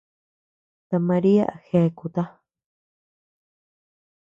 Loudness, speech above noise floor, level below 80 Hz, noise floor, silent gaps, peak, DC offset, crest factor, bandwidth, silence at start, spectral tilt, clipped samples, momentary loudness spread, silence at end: -22 LUFS; over 69 dB; -64 dBFS; under -90 dBFS; none; -8 dBFS; under 0.1%; 18 dB; 7.4 kHz; 0.9 s; -10 dB/octave; under 0.1%; 10 LU; 2.05 s